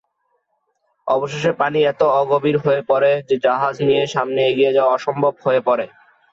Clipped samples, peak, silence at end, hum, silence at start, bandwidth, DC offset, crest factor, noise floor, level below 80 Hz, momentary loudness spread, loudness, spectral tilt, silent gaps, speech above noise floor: under 0.1%; -4 dBFS; 0.45 s; none; 1.05 s; 7.6 kHz; under 0.1%; 14 dB; -69 dBFS; -62 dBFS; 5 LU; -17 LUFS; -6 dB/octave; none; 52 dB